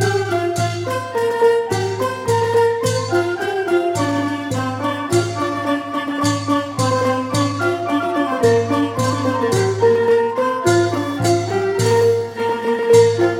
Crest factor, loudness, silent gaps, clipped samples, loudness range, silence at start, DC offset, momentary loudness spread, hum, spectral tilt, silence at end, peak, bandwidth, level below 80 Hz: 16 dB; -18 LUFS; none; under 0.1%; 3 LU; 0 s; under 0.1%; 6 LU; none; -5.5 dB/octave; 0 s; 0 dBFS; 16 kHz; -54 dBFS